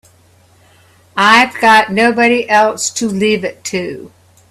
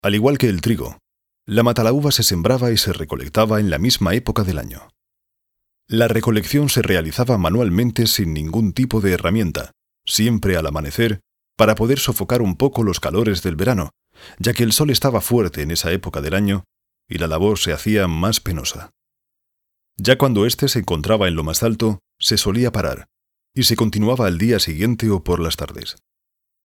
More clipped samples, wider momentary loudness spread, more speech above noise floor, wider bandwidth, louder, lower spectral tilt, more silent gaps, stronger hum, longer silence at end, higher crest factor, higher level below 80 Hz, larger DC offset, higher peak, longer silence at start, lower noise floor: neither; first, 13 LU vs 8 LU; second, 36 dB vs 61 dB; second, 14 kHz vs 18 kHz; first, -11 LUFS vs -18 LUFS; second, -3 dB/octave vs -5 dB/octave; neither; neither; second, 0.45 s vs 0.75 s; about the same, 14 dB vs 18 dB; second, -56 dBFS vs -36 dBFS; neither; about the same, 0 dBFS vs 0 dBFS; first, 1.15 s vs 0.05 s; second, -48 dBFS vs -79 dBFS